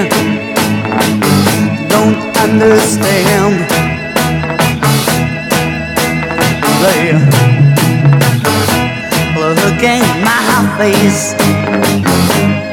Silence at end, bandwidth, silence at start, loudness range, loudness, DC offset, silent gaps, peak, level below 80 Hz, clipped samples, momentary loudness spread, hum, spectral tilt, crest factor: 0 s; 18 kHz; 0 s; 2 LU; -10 LUFS; under 0.1%; none; 0 dBFS; -36 dBFS; 0.3%; 5 LU; none; -5 dB/octave; 10 dB